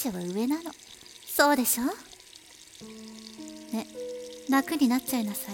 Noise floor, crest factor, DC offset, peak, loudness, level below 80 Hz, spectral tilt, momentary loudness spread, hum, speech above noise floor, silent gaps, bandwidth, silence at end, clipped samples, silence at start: -51 dBFS; 24 dB; under 0.1%; -6 dBFS; -28 LUFS; -66 dBFS; -3 dB/octave; 23 LU; none; 22 dB; none; 17.5 kHz; 0 s; under 0.1%; 0 s